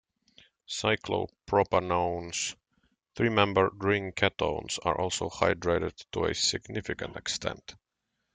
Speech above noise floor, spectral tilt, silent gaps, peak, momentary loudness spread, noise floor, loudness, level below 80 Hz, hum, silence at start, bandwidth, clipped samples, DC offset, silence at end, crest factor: 53 dB; -3.5 dB/octave; none; -8 dBFS; 10 LU; -82 dBFS; -29 LUFS; -56 dBFS; none; 0.7 s; 9.6 kHz; under 0.1%; under 0.1%; 0.6 s; 22 dB